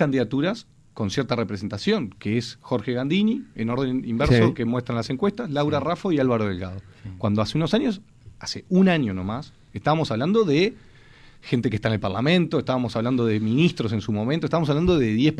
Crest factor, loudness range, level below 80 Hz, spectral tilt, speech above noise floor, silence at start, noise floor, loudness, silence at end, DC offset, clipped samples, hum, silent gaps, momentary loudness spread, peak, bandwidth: 16 dB; 2 LU; -46 dBFS; -7 dB/octave; 26 dB; 0 s; -49 dBFS; -23 LUFS; 0 s; under 0.1%; under 0.1%; none; none; 10 LU; -8 dBFS; 10.5 kHz